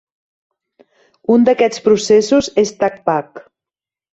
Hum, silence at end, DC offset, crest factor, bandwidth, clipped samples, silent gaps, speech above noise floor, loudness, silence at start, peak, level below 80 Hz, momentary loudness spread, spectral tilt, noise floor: none; 0.75 s; under 0.1%; 16 dB; 8.2 kHz; under 0.1%; none; 75 dB; -14 LUFS; 1.3 s; -2 dBFS; -54 dBFS; 7 LU; -4.5 dB/octave; -89 dBFS